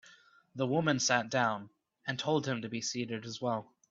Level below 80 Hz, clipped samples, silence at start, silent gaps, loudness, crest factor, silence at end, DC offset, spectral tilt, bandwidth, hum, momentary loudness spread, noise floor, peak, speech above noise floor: -74 dBFS; under 0.1%; 0.1 s; none; -33 LUFS; 22 dB; 0.25 s; under 0.1%; -4 dB/octave; 8 kHz; none; 10 LU; -61 dBFS; -12 dBFS; 29 dB